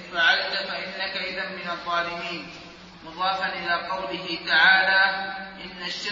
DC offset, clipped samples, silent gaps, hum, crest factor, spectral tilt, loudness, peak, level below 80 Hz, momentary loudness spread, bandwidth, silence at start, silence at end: under 0.1%; under 0.1%; none; none; 20 dB; -2.5 dB/octave; -23 LUFS; -4 dBFS; -60 dBFS; 19 LU; 7.6 kHz; 0 s; 0 s